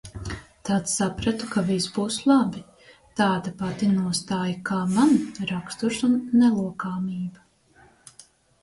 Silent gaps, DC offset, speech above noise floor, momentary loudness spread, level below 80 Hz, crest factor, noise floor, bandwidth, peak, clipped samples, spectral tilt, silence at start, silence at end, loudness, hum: none; under 0.1%; 33 dB; 14 LU; -52 dBFS; 18 dB; -57 dBFS; 11.5 kHz; -8 dBFS; under 0.1%; -5 dB/octave; 0.05 s; 1.25 s; -24 LUFS; none